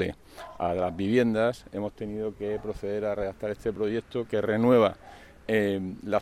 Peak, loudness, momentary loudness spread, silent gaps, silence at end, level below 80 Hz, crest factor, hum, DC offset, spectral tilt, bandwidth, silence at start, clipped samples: -10 dBFS; -28 LUFS; 12 LU; none; 0 s; -54 dBFS; 18 dB; none; under 0.1%; -7 dB/octave; 14 kHz; 0 s; under 0.1%